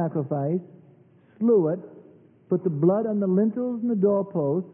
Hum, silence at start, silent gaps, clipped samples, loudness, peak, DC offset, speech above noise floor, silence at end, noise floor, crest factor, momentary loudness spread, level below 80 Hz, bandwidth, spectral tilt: none; 0 s; none; under 0.1%; -24 LUFS; -10 dBFS; under 0.1%; 32 dB; 0 s; -55 dBFS; 16 dB; 7 LU; -76 dBFS; 2.9 kHz; -15 dB/octave